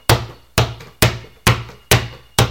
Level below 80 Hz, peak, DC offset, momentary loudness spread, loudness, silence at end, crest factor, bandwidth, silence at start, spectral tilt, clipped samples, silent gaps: -30 dBFS; 0 dBFS; under 0.1%; 5 LU; -18 LUFS; 0 s; 18 dB; over 20 kHz; 0.1 s; -4 dB/octave; under 0.1%; none